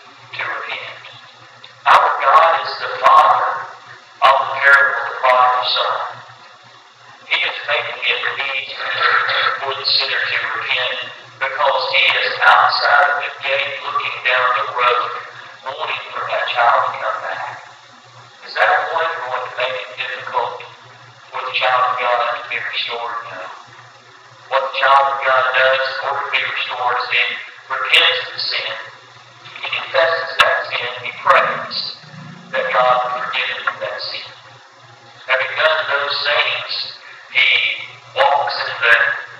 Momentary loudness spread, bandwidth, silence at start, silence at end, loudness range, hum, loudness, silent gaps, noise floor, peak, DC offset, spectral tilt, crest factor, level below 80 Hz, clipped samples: 15 LU; 14.5 kHz; 0.05 s; 0 s; 6 LU; none; -16 LUFS; none; -44 dBFS; 0 dBFS; under 0.1%; -1.5 dB/octave; 18 dB; -68 dBFS; under 0.1%